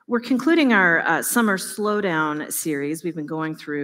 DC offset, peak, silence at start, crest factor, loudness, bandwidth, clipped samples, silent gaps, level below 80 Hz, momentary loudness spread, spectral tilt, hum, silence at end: under 0.1%; -4 dBFS; 0.1 s; 18 dB; -21 LUFS; 16 kHz; under 0.1%; none; -74 dBFS; 12 LU; -4 dB/octave; none; 0 s